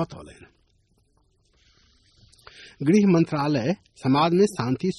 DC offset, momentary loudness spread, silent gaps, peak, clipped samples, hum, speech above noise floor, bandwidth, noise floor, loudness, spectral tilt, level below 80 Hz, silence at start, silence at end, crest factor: under 0.1%; 10 LU; none; -8 dBFS; under 0.1%; none; 43 dB; 11.5 kHz; -65 dBFS; -22 LUFS; -7 dB/octave; -60 dBFS; 0 s; 0 s; 16 dB